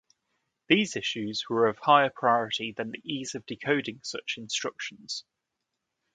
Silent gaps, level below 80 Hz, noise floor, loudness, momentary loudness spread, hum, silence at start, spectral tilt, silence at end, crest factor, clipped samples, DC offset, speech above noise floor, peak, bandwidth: none; -72 dBFS; -84 dBFS; -28 LUFS; 14 LU; none; 0.7 s; -3.5 dB/octave; 0.95 s; 24 dB; under 0.1%; under 0.1%; 56 dB; -6 dBFS; 9.4 kHz